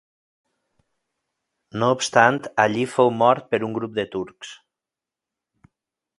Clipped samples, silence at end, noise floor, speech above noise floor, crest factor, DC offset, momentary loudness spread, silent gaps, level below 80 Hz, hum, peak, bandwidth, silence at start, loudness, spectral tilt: under 0.1%; 1.65 s; -88 dBFS; 68 dB; 24 dB; under 0.1%; 18 LU; none; -64 dBFS; none; 0 dBFS; 11.5 kHz; 1.75 s; -20 LUFS; -4.5 dB/octave